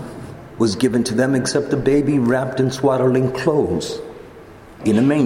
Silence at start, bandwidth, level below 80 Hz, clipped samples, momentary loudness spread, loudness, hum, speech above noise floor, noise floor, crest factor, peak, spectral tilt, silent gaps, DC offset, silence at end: 0 s; 16 kHz; -46 dBFS; under 0.1%; 16 LU; -18 LUFS; none; 23 dB; -40 dBFS; 16 dB; -2 dBFS; -6 dB/octave; none; under 0.1%; 0 s